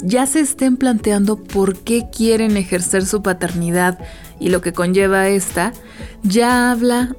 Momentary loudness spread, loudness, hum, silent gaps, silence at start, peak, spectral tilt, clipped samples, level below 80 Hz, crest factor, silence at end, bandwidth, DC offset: 7 LU; -16 LUFS; none; none; 0 s; -2 dBFS; -4.5 dB/octave; under 0.1%; -38 dBFS; 14 dB; 0 s; 19 kHz; 0.2%